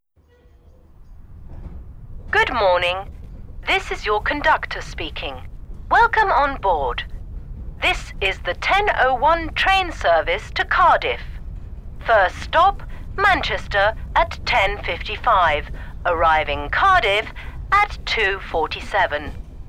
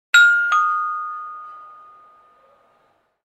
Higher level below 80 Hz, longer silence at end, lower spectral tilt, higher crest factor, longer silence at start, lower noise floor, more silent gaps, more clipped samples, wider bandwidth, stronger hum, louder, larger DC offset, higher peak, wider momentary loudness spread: first, -32 dBFS vs -80 dBFS; second, 0 s vs 1.6 s; first, -4 dB/octave vs 4.5 dB/octave; about the same, 16 dB vs 20 dB; first, 1 s vs 0.15 s; second, -54 dBFS vs -62 dBFS; neither; neither; first, 15.5 kHz vs 13.5 kHz; neither; second, -19 LUFS vs -16 LUFS; neither; second, -4 dBFS vs 0 dBFS; second, 20 LU vs 23 LU